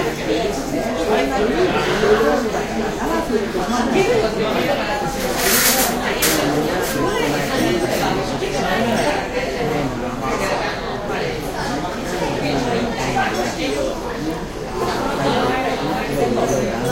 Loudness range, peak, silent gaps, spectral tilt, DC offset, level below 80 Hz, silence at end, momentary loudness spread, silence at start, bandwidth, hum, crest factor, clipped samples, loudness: 4 LU; -2 dBFS; none; -4 dB/octave; under 0.1%; -36 dBFS; 0 s; 7 LU; 0 s; 16 kHz; none; 18 dB; under 0.1%; -19 LUFS